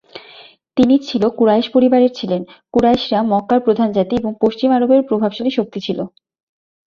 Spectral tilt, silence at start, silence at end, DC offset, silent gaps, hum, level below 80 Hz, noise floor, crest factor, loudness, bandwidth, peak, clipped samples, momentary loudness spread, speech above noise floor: -7 dB/octave; 0.15 s; 0.8 s; under 0.1%; none; none; -50 dBFS; -43 dBFS; 14 dB; -16 LUFS; 7 kHz; -2 dBFS; under 0.1%; 10 LU; 28 dB